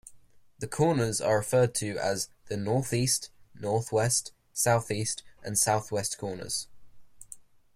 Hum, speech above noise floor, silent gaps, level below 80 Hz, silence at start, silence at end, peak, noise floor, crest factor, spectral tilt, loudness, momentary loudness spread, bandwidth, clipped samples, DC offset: none; 26 dB; none; -60 dBFS; 0.05 s; 0.35 s; -12 dBFS; -54 dBFS; 18 dB; -4 dB/octave; -28 LUFS; 14 LU; 16 kHz; under 0.1%; under 0.1%